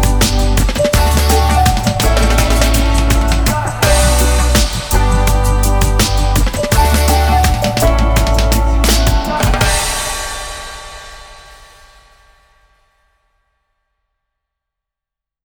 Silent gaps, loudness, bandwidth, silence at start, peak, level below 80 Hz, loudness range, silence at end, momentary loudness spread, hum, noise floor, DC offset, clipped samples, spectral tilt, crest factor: none; -13 LUFS; over 20 kHz; 0 s; 0 dBFS; -16 dBFS; 7 LU; 4.1 s; 6 LU; none; -85 dBFS; under 0.1%; under 0.1%; -4 dB/octave; 12 dB